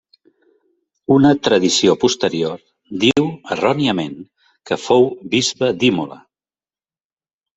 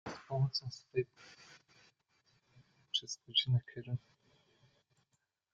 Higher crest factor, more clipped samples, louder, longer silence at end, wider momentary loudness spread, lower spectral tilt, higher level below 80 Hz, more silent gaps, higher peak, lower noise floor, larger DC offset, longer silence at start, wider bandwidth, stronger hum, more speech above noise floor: about the same, 18 dB vs 22 dB; neither; first, -16 LUFS vs -37 LUFS; second, 1.4 s vs 1.55 s; about the same, 15 LU vs 17 LU; about the same, -4.5 dB/octave vs -5 dB/octave; first, -56 dBFS vs -74 dBFS; neither; first, 0 dBFS vs -18 dBFS; first, under -90 dBFS vs -83 dBFS; neither; first, 1.1 s vs 0.05 s; about the same, 8.4 kHz vs 7.8 kHz; neither; first, over 74 dB vs 45 dB